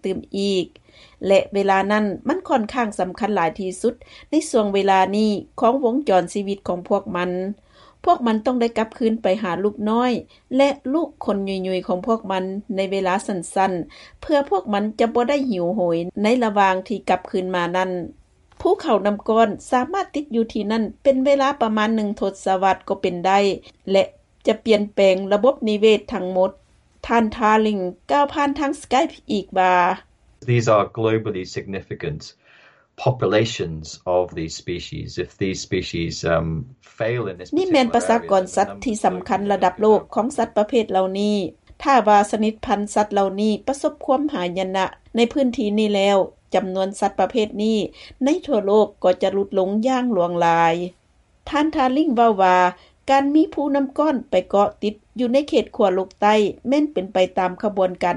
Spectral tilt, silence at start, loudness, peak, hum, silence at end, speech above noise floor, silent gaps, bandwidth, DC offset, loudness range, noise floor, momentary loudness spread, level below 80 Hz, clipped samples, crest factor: -5.5 dB/octave; 0.05 s; -20 LUFS; -4 dBFS; none; 0 s; 33 dB; none; 11.5 kHz; under 0.1%; 4 LU; -52 dBFS; 9 LU; -52 dBFS; under 0.1%; 16 dB